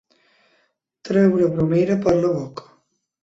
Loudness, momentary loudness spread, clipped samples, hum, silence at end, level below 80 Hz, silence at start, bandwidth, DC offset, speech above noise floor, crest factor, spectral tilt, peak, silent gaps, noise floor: -19 LUFS; 12 LU; under 0.1%; none; 0.65 s; -52 dBFS; 1.05 s; 7.8 kHz; under 0.1%; 49 dB; 16 dB; -8.5 dB/octave; -4 dBFS; none; -66 dBFS